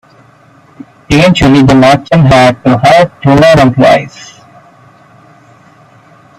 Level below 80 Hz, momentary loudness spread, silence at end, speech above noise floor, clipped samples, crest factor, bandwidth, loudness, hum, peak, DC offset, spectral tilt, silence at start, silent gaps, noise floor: -32 dBFS; 4 LU; 2.15 s; 36 dB; 0.3%; 8 dB; 13.5 kHz; -6 LUFS; none; 0 dBFS; under 0.1%; -6.5 dB/octave; 1.1 s; none; -41 dBFS